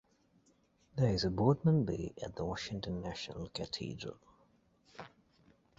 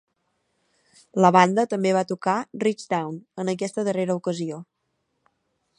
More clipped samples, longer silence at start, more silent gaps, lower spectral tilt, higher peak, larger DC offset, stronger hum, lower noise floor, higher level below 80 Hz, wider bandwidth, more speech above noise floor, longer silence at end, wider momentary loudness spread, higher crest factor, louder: neither; second, 0.95 s vs 1.15 s; neither; about the same, -7 dB/octave vs -6 dB/octave; second, -14 dBFS vs -2 dBFS; neither; neither; second, -71 dBFS vs -75 dBFS; first, -58 dBFS vs -74 dBFS; second, 7.8 kHz vs 11 kHz; second, 36 dB vs 52 dB; second, 0.7 s vs 1.15 s; first, 18 LU vs 13 LU; about the same, 22 dB vs 22 dB; second, -36 LUFS vs -23 LUFS